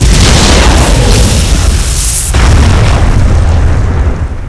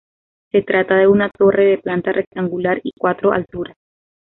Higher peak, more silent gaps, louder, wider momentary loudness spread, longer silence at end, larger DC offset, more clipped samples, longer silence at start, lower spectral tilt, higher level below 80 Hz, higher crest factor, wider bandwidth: about the same, 0 dBFS vs -2 dBFS; second, none vs 2.27-2.31 s; first, -7 LUFS vs -16 LUFS; second, 5 LU vs 9 LU; second, 0 s vs 0.7 s; neither; first, 4% vs under 0.1%; second, 0 s vs 0.55 s; second, -4.5 dB/octave vs -10.5 dB/octave; first, -8 dBFS vs -54 dBFS; second, 6 dB vs 14 dB; first, 11 kHz vs 4.1 kHz